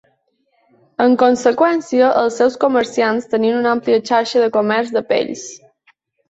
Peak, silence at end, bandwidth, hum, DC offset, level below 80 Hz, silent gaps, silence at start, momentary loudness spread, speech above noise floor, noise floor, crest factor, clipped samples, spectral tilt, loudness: -2 dBFS; 0.75 s; 8 kHz; none; under 0.1%; -62 dBFS; none; 1 s; 6 LU; 49 dB; -64 dBFS; 16 dB; under 0.1%; -4.5 dB/octave; -15 LUFS